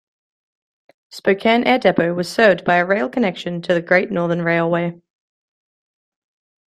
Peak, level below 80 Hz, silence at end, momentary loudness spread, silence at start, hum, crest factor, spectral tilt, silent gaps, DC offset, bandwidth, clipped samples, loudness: -2 dBFS; -60 dBFS; 1.7 s; 7 LU; 1.15 s; none; 18 dB; -6 dB/octave; none; under 0.1%; 13 kHz; under 0.1%; -17 LUFS